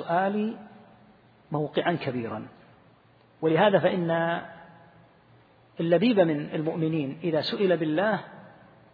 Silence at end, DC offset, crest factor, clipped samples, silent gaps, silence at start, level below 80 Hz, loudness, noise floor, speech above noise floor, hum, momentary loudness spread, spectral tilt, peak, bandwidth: 0.45 s; under 0.1%; 20 dB; under 0.1%; none; 0 s; -72 dBFS; -26 LUFS; -59 dBFS; 33 dB; none; 13 LU; -9 dB/octave; -8 dBFS; 5 kHz